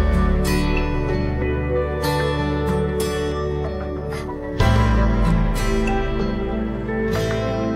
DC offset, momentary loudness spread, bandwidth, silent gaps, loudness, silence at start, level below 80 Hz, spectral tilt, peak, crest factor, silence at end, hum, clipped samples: under 0.1%; 7 LU; 16 kHz; none; -22 LUFS; 0 s; -24 dBFS; -6.5 dB/octave; -4 dBFS; 16 dB; 0 s; none; under 0.1%